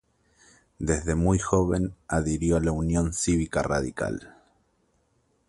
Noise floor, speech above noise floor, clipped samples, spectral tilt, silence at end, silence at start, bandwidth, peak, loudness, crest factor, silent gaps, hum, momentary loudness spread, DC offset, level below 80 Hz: -69 dBFS; 44 dB; under 0.1%; -6 dB/octave; 1.2 s; 0.8 s; 11.5 kHz; -6 dBFS; -26 LUFS; 20 dB; none; none; 7 LU; under 0.1%; -38 dBFS